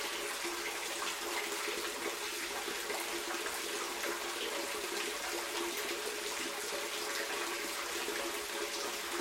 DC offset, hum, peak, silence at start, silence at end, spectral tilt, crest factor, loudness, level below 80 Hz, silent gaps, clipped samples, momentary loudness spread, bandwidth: under 0.1%; none; -22 dBFS; 0 s; 0 s; 0 dB/octave; 18 dB; -37 LUFS; -70 dBFS; none; under 0.1%; 1 LU; 16.5 kHz